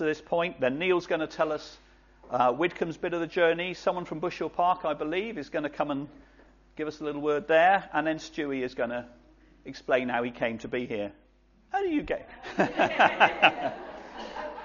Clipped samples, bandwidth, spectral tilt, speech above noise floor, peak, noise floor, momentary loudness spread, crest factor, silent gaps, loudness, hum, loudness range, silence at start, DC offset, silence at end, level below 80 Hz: under 0.1%; 7.2 kHz; -2.5 dB/octave; 34 dB; -4 dBFS; -61 dBFS; 15 LU; 24 dB; none; -28 LUFS; none; 5 LU; 0 s; under 0.1%; 0 s; -60 dBFS